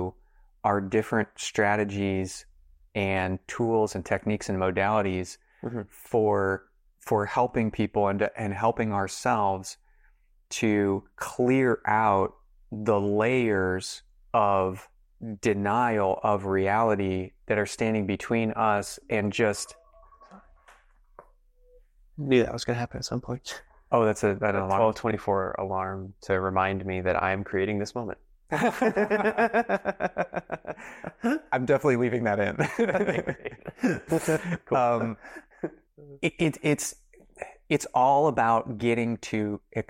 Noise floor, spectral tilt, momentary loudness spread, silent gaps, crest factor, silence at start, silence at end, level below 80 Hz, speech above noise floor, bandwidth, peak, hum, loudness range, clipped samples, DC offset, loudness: -61 dBFS; -5.5 dB/octave; 13 LU; none; 18 dB; 0 s; 0.05 s; -58 dBFS; 35 dB; 16 kHz; -8 dBFS; none; 3 LU; under 0.1%; under 0.1%; -27 LUFS